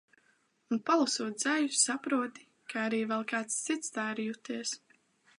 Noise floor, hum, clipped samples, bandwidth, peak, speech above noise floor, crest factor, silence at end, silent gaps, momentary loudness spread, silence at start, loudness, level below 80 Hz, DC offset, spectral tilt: -71 dBFS; none; under 0.1%; 11.5 kHz; -14 dBFS; 39 dB; 20 dB; 0.6 s; none; 10 LU; 0.7 s; -32 LUFS; -88 dBFS; under 0.1%; -2 dB/octave